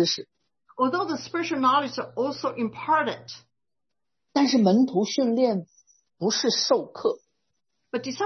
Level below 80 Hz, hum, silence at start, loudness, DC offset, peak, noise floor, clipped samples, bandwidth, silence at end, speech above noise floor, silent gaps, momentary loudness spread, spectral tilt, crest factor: -74 dBFS; none; 0 s; -25 LUFS; under 0.1%; -8 dBFS; -87 dBFS; under 0.1%; 6.4 kHz; 0 s; 63 dB; none; 12 LU; -4 dB/octave; 18 dB